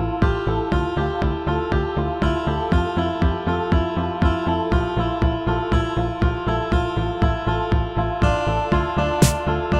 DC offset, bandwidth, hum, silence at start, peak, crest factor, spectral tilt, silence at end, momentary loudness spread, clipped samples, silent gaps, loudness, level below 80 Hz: 0.2%; 15.5 kHz; none; 0 s; -4 dBFS; 16 dB; -6.5 dB/octave; 0 s; 3 LU; under 0.1%; none; -21 LUFS; -26 dBFS